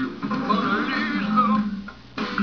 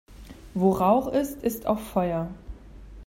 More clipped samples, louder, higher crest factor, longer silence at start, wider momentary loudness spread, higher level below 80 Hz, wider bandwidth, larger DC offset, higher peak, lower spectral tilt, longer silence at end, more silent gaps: neither; about the same, -23 LUFS vs -25 LUFS; about the same, 16 dB vs 18 dB; about the same, 0 s vs 0.1 s; second, 11 LU vs 20 LU; second, -54 dBFS vs -46 dBFS; second, 5.4 kHz vs 16 kHz; first, 0.3% vs under 0.1%; about the same, -8 dBFS vs -8 dBFS; about the same, -6.5 dB/octave vs -7 dB/octave; about the same, 0 s vs 0 s; neither